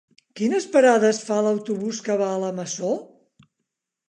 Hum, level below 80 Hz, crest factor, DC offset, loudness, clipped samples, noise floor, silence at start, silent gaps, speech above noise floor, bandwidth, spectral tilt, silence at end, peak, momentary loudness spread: none; -78 dBFS; 18 dB; under 0.1%; -22 LUFS; under 0.1%; -81 dBFS; 0.35 s; none; 60 dB; 10 kHz; -4.5 dB/octave; 1.05 s; -6 dBFS; 11 LU